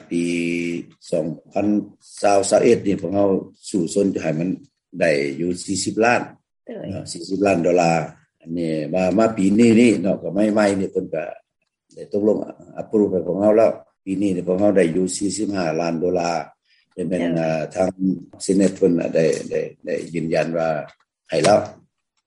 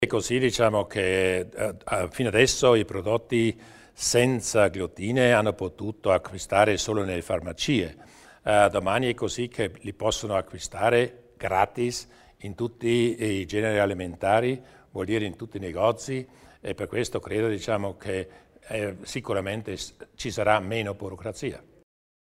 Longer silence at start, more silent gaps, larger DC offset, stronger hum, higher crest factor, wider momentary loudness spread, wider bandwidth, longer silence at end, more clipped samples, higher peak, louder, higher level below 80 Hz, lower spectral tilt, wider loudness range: about the same, 0.1 s vs 0 s; neither; neither; neither; second, 16 dB vs 22 dB; about the same, 14 LU vs 14 LU; second, 11.5 kHz vs 16 kHz; second, 0.5 s vs 0.7 s; neither; about the same, -4 dBFS vs -4 dBFS; first, -20 LUFS vs -26 LUFS; second, -60 dBFS vs -52 dBFS; about the same, -5.5 dB/octave vs -4.5 dB/octave; about the same, 4 LU vs 6 LU